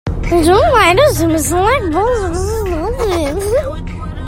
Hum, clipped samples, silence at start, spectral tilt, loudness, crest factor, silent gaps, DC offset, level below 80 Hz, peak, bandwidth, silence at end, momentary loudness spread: none; under 0.1%; 0.05 s; -5 dB/octave; -13 LUFS; 14 dB; none; under 0.1%; -24 dBFS; 0 dBFS; 16.5 kHz; 0 s; 9 LU